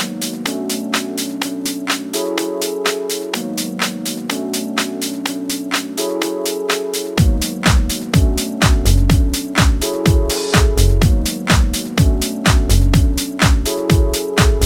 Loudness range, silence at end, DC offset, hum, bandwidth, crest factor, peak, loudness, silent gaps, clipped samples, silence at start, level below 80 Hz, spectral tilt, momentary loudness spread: 5 LU; 0 s; under 0.1%; none; 17 kHz; 16 dB; 0 dBFS; -17 LUFS; none; under 0.1%; 0 s; -20 dBFS; -4.5 dB/octave; 7 LU